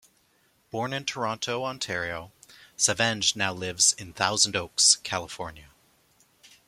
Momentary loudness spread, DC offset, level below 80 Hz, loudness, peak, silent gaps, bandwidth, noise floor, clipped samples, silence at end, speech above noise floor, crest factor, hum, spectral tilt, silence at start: 17 LU; under 0.1%; -62 dBFS; -24 LUFS; -4 dBFS; none; 16.5 kHz; -66 dBFS; under 0.1%; 1.05 s; 39 dB; 24 dB; none; -1 dB/octave; 0.75 s